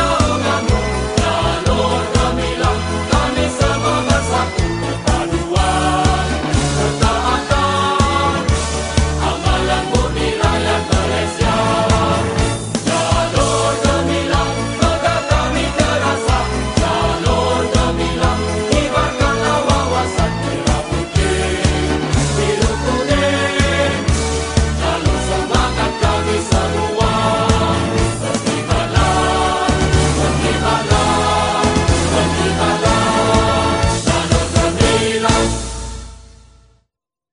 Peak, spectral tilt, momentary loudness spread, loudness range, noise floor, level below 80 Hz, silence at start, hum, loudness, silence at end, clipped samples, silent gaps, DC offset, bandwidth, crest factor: 0 dBFS; -4.5 dB/octave; 4 LU; 2 LU; -71 dBFS; -24 dBFS; 0 s; none; -16 LUFS; 1.05 s; under 0.1%; none; under 0.1%; 11 kHz; 16 dB